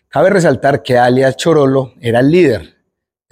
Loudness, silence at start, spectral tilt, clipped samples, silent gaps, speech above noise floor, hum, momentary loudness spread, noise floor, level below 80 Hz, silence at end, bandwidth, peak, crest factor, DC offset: -12 LUFS; 0.15 s; -6.5 dB/octave; under 0.1%; none; 61 dB; none; 5 LU; -72 dBFS; -48 dBFS; 0.65 s; 15.5 kHz; 0 dBFS; 12 dB; under 0.1%